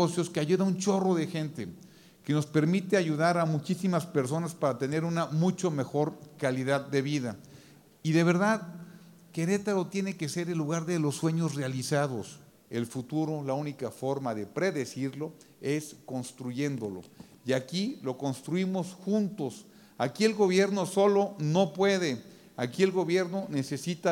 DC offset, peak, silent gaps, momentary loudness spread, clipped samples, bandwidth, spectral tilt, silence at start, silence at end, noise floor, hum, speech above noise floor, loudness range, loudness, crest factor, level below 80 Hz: under 0.1%; -10 dBFS; none; 12 LU; under 0.1%; 17 kHz; -6 dB/octave; 0 s; 0 s; -55 dBFS; none; 26 dB; 6 LU; -30 LUFS; 18 dB; -76 dBFS